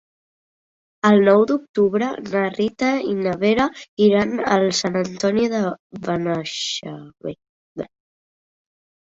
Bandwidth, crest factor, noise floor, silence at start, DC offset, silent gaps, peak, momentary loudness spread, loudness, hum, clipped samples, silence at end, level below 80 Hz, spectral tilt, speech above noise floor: 7.8 kHz; 18 dB; under -90 dBFS; 1.05 s; under 0.1%; 1.69-1.74 s, 3.89-3.97 s, 5.79-5.90 s, 7.49-7.75 s; -2 dBFS; 18 LU; -19 LUFS; none; under 0.1%; 1.3 s; -58 dBFS; -5 dB/octave; over 71 dB